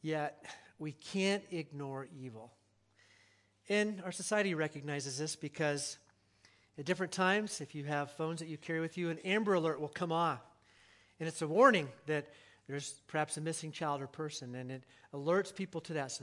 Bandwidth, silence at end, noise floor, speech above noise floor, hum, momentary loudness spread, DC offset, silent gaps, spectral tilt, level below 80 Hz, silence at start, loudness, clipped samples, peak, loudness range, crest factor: 12 kHz; 0 s; -70 dBFS; 34 dB; none; 14 LU; under 0.1%; none; -4.5 dB/octave; -84 dBFS; 0.05 s; -36 LUFS; under 0.1%; -12 dBFS; 7 LU; 26 dB